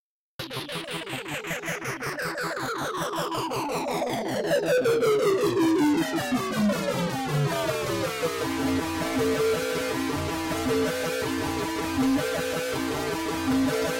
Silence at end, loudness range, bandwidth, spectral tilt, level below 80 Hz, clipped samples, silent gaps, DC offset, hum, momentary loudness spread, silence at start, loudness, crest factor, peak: 0 s; 5 LU; 16.5 kHz; -4.5 dB/octave; -52 dBFS; under 0.1%; none; under 0.1%; none; 8 LU; 0.4 s; -27 LUFS; 12 dB; -14 dBFS